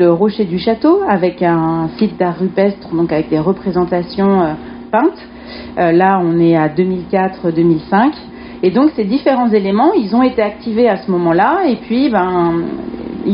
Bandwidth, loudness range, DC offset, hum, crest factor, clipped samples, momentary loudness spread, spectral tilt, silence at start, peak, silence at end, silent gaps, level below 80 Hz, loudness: 5.4 kHz; 2 LU; under 0.1%; none; 12 dB; under 0.1%; 6 LU; -6 dB/octave; 0 s; 0 dBFS; 0 s; none; -44 dBFS; -14 LUFS